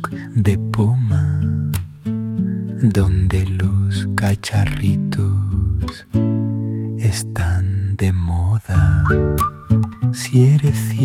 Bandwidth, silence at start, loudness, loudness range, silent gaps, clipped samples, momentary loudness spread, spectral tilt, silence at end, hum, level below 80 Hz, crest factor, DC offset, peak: 16 kHz; 0 s; -18 LUFS; 3 LU; none; under 0.1%; 7 LU; -7 dB/octave; 0 s; none; -32 dBFS; 14 dB; under 0.1%; -2 dBFS